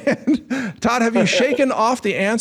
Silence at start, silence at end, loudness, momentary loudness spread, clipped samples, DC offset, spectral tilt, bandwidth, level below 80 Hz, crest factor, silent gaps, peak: 0 s; 0 s; -18 LUFS; 5 LU; under 0.1%; under 0.1%; -4.5 dB/octave; 13.5 kHz; -54 dBFS; 12 dB; none; -6 dBFS